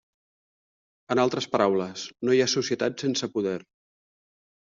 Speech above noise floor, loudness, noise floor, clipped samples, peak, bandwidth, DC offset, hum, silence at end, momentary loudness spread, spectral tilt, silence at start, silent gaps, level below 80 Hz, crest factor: over 65 dB; -26 LUFS; under -90 dBFS; under 0.1%; -8 dBFS; 7.6 kHz; under 0.1%; none; 1 s; 8 LU; -3.5 dB/octave; 1.1 s; none; -70 dBFS; 20 dB